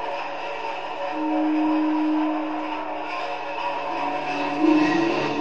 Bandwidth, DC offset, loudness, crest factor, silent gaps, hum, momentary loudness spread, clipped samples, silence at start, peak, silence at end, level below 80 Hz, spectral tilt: 7.6 kHz; 1%; -24 LUFS; 16 dB; none; none; 10 LU; under 0.1%; 0 s; -8 dBFS; 0 s; -66 dBFS; -5.5 dB/octave